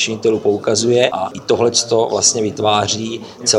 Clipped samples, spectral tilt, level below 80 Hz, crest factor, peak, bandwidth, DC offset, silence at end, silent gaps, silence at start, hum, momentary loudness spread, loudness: under 0.1%; -3 dB/octave; -56 dBFS; 16 dB; 0 dBFS; 12 kHz; under 0.1%; 0 s; none; 0 s; none; 6 LU; -15 LUFS